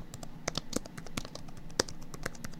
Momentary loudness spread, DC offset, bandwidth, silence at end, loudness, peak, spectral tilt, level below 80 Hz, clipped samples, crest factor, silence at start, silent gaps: 12 LU; under 0.1%; 16.5 kHz; 0 s; -38 LUFS; -4 dBFS; -3 dB/octave; -46 dBFS; under 0.1%; 34 dB; 0 s; none